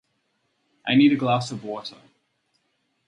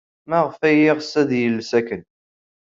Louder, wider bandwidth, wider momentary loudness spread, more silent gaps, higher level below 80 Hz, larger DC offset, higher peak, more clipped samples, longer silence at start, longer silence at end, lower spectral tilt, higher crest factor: second, -22 LUFS vs -19 LUFS; first, 9.6 kHz vs 7.6 kHz; first, 17 LU vs 8 LU; neither; second, -70 dBFS vs -64 dBFS; neither; about the same, -6 dBFS vs -4 dBFS; neither; first, 0.85 s vs 0.3 s; first, 1.2 s vs 0.75 s; about the same, -6 dB/octave vs -6 dB/octave; about the same, 18 dB vs 16 dB